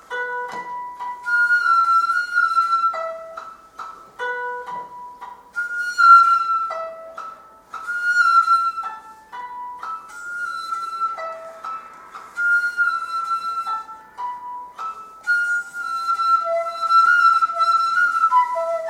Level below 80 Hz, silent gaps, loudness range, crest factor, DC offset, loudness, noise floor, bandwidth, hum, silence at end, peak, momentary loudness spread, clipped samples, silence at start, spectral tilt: -68 dBFS; none; 8 LU; 20 dB; under 0.1%; -18 LUFS; -40 dBFS; 13 kHz; none; 0 s; -2 dBFS; 21 LU; under 0.1%; 0.1 s; 0 dB/octave